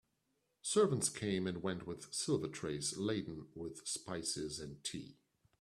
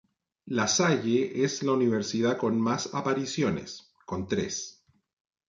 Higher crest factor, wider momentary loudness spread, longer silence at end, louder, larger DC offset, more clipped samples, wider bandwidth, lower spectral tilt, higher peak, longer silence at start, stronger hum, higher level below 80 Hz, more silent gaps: about the same, 20 dB vs 16 dB; about the same, 13 LU vs 12 LU; second, 0.5 s vs 0.8 s; second, -39 LUFS vs -28 LUFS; neither; neither; first, 13.5 kHz vs 9.4 kHz; about the same, -4 dB/octave vs -4.5 dB/octave; second, -20 dBFS vs -12 dBFS; first, 0.65 s vs 0.45 s; neither; second, -70 dBFS vs -60 dBFS; neither